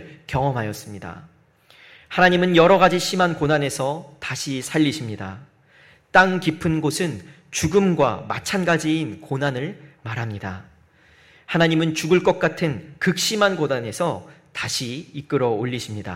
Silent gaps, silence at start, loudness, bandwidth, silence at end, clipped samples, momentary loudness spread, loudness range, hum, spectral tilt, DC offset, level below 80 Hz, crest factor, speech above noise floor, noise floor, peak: none; 0 s; -21 LUFS; 16 kHz; 0 s; under 0.1%; 16 LU; 5 LU; none; -5 dB/octave; under 0.1%; -52 dBFS; 20 dB; 33 dB; -54 dBFS; -2 dBFS